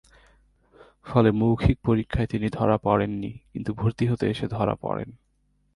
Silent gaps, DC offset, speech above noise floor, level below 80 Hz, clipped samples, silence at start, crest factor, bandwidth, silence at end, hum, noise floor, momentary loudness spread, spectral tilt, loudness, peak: none; under 0.1%; 44 dB; -40 dBFS; under 0.1%; 1.05 s; 22 dB; 11 kHz; 0.65 s; none; -68 dBFS; 12 LU; -9 dB/octave; -25 LUFS; -4 dBFS